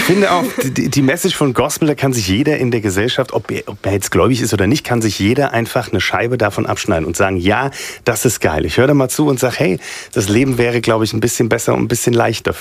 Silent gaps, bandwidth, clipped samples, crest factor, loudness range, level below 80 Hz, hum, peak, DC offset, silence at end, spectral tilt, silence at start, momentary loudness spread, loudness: none; 16 kHz; under 0.1%; 14 dB; 1 LU; -40 dBFS; none; 0 dBFS; under 0.1%; 0 s; -5 dB/octave; 0 s; 5 LU; -15 LUFS